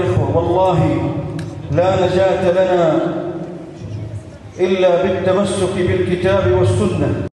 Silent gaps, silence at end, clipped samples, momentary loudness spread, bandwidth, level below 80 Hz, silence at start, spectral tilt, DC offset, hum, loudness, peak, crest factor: none; 0.05 s; under 0.1%; 14 LU; 11 kHz; -40 dBFS; 0 s; -7 dB/octave; under 0.1%; none; -16 LUFS; -4 dBFS; 12 dB